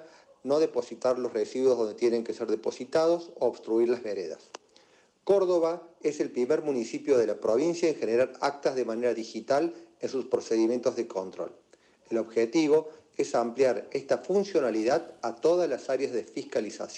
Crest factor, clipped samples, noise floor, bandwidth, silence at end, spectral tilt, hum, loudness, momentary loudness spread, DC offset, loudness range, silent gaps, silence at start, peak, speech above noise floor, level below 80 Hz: 16 dB; under 0.1%; -62 dBFS; 10.5 kHz; 0 s; -5 dB/octave; none; -28 LUFS; 9 LU; under 0.1%; 2 LU; none; 0 s; -12 dBFS; 34 dB; -76 dBFS